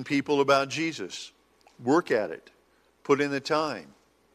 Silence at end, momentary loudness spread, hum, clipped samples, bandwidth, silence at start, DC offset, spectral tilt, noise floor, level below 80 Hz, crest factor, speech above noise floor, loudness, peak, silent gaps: 0.5 s; 17 LU; none; under 0.1%; 14 kHz; 0 s; under 0.1%; -4.5 dB/octave; -58 dBFS; -72 dBFS; 20 dB; 32 dB; -27 LUFS; -8 dBFS; none